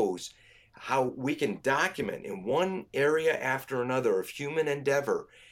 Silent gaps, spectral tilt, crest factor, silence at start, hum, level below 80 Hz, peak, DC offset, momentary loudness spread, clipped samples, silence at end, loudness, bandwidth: none; -5 dB/octave; 18 dB; 0 s; none; -68 dBFS; -12 dBFS; under 0.1%; 8 LU; under 0.1%; 0.3 s; -30 LUFS; 16.5 kHz